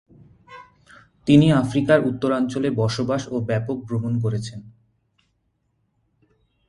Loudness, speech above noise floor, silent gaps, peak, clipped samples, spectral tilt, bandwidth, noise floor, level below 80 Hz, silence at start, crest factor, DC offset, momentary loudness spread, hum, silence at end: -21 LUFS; 50 dB; none; -2 dBFS; under 0.1%; -7 dB/octave; 11.5 kHz; -70 dBFS; -52 dBFS; 0.5 s; 22 dB; under 0.1%; 12 LU; none; 2 s